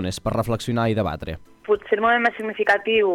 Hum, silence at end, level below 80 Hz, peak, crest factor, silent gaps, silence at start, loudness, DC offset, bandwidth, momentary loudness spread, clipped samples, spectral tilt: none; 0 s; -44 dBFS; -6 dBFS; 16 dB; none; 0 s; -21 LUFS; under 0.1%; 15.5 kHz; 10 LU; under 0.1%; -5.5 dB/octave